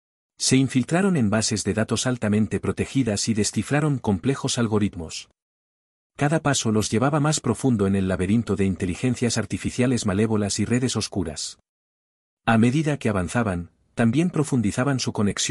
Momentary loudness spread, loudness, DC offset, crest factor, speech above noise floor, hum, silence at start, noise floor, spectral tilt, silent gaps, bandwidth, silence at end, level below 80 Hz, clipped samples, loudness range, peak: 6 LU; -23 LUFS; under 0.1%; 18 dB; over 68 dB; none; 0.4 s; under -90 dBFS; -5 dB/octave; 5.42-6.10 s, 11.69-12.37 s; 12 kHz; 0 s; -50 dBFS; under 0.1%; 2 LU; -6 dBFS